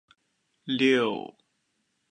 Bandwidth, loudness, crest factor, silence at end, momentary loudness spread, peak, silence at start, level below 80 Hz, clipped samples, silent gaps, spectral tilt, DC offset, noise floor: 9.8 kHz; -25 LUFS; 20 dB; 0.85 s; 22 LU; -10 dBFS; 0.65 s; -78 dBFS; under 0.1%; none; -5 dB/octave; under 0.1%; -75 dBFS